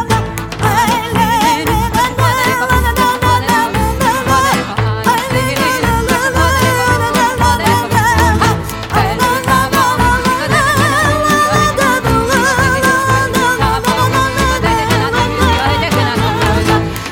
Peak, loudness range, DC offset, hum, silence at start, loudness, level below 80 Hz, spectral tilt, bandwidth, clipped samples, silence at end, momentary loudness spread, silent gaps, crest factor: 0 dBFS; 1 LU; under 0.1%; none; 0 s; -12 LUFS; -24 dBFS; -4.5 dB/octave; 17.5 kHz; under 0.1%; 0 s; 3 LU; none; 12 dB